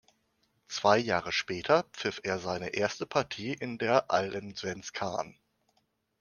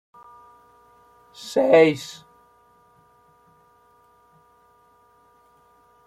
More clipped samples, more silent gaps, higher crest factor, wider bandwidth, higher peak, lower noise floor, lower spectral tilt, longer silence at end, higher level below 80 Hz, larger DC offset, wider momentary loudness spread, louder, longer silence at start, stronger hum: neither; neither; about the same, 24 dB vs 24 dB; second, 10 kHz vs 13.5 kHz; second, -8 dBFS vs -4 dBFS; first, -75 dBFS vs -58 dBFS; about the same, -4 dB/octave vs -5 dB/octave; second, 0.9 s vs 3.95 s; about the same, -68 dBFS vs -70 dBFS; neither; second, 11 LU vs 25 LU; second, -31 LUFS vs -19 LUFS; second, 0.7 s vs 1.4 s; neither